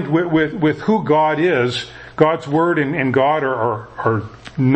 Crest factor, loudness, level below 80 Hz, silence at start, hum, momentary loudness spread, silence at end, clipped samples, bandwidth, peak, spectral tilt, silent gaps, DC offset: 16 dB; -17 LUFS; -50 dBFS; 0 s; none; 6 LU; 0 s; under 0.1%; 8.6 kHz; 0 dBFS; -7.5 dB/octave; none; under 0.1%